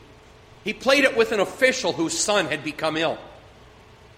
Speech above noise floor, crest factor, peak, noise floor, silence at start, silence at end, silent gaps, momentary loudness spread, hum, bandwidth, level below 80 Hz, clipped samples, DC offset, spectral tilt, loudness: 27 dB; 22 dB; -2 dBFS; -49 dBFS; 0.65 s; 0.8 s; none; 10 LU; none; 16 kHz; -56 dBFS; under 0.1%; under 0.1%; -2.5 dB/octave; -22 LUFS